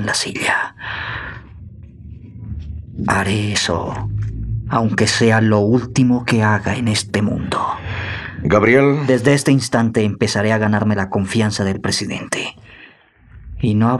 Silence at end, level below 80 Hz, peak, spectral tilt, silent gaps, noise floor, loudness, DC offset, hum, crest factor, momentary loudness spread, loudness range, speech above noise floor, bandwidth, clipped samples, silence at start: 0 s; -40 dBFS; 0 dBFS; -5 dB/octave; none; -47 dBFS; -17 LUFS; under 0.1%; none; 16 dB; 15 LU; 7 LU; 31 dB; 12.5 kHz; under 0.1%; 0 s